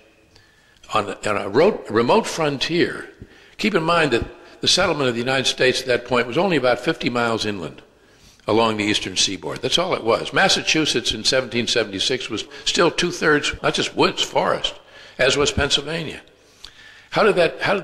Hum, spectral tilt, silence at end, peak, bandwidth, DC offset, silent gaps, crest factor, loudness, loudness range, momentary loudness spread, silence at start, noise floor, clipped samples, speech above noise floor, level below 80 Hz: none; -3 dB/octave; 0 s; -6 dBFS; 14 kHz; under 0.1%; none; 14 dB; -19 LUFS; 2 LU; 8 LU; 0.9 s; -53 dBFS; under 0.1%; 33 dB; -46 dBFS